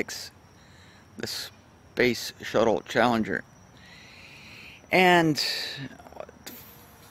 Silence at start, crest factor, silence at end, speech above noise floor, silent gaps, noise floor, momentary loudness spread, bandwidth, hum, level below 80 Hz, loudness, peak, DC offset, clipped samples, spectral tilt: 0 s; 24 dB; 0.4 s; 28 dB; none; -53 dBFS; 24 LU; 16 kHz; none; -60 dBFS; -25 LUFS; -4 dBFS; under 0.1%; under 0.1%; -4 dB/octave